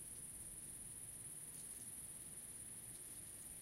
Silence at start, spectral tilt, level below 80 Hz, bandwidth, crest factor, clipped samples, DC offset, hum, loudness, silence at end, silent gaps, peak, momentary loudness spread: 0 s; -2 dB/octave; -70 dBFS; 16 kHz; 14 dB; under 0.1%; under 0.1%; none; -50 LUFS; 0 s; none; -40 dBFS; 1 LU